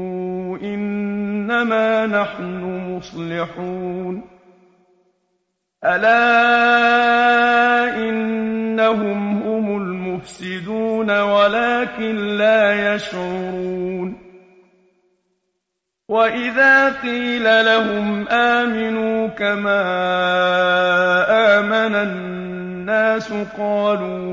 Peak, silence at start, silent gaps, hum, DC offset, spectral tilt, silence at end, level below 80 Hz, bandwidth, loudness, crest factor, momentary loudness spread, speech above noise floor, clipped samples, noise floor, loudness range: -2 dBFS; 0 s; none; none; under 0.1%; -5.5 dB/octave; 0 s; -56 dBFS; 8 kHz; -17 LUFS; 16 dB; 13 LU; 61 dB; under 0.1%; -78 dBFS; 9 LU